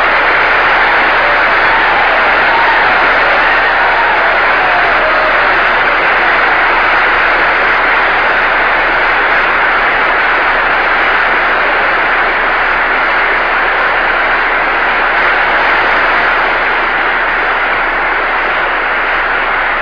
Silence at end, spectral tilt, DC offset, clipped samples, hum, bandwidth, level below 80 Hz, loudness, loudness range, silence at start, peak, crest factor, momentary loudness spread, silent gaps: 0 s; -4 dB/octave; under 0.1%; under 0.1%; none; 5.4 kHz; -32 dBFS; -9 LUFS; 2 LU; 0 s; 0 dBFS; 10 dB; 3 LU; none